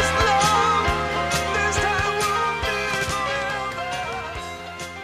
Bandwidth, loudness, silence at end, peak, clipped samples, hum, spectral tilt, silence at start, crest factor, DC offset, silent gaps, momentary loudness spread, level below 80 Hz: 15.5 kHz; -22 LUFS; 0 s; -6 dBFS; under 0.1%; none; -3 dB/octave; 0 s; 16 dB; under 0.1%; none; 13 LU; -38 dBFS